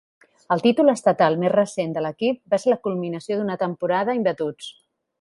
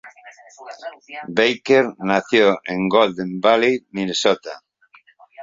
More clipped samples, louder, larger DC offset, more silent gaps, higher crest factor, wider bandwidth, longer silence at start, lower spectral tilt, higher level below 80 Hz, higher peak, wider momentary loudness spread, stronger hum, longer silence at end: neither; second, -22 LUFS vs -18 LUFS; neither; neither; about the same, 18 dB vs 18 dB; first, 11.5 kHz vs 7.8 kHz; first, 0.5 s vs 0.05 s; first, -6 dB/octave vs -4.5 dB/octave; second, -68 dBFS vs -62 dBFS; about the same, -4 dBFS vs -2 dBFS; second, 10 LU vs 19 LU; neither; first, 0.5 s vs 0 s